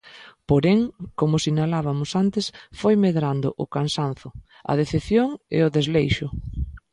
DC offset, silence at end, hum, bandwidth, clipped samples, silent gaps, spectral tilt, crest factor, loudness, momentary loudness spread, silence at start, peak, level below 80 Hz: under 0.1%; 0.15 s; none; 11 kHz; under 0.1%; none; -6.5 dB/octave; 16 dB; -23 LUFS; 12 LU; 0.05 s; -6 dBFS; -40 dBFS